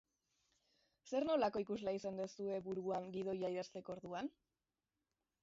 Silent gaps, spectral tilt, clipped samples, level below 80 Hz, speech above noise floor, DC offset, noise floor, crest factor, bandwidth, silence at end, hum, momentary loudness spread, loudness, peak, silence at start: none; -5 dB/octave; under 0.1%; -78 dBFS; over 48 dB; under 0.1%; under -90 dBFS; 18 dB; 7.6 kHz; 1.1 s; none; 10 LU; -43 LUFS; -26 dBFS; 1.05 s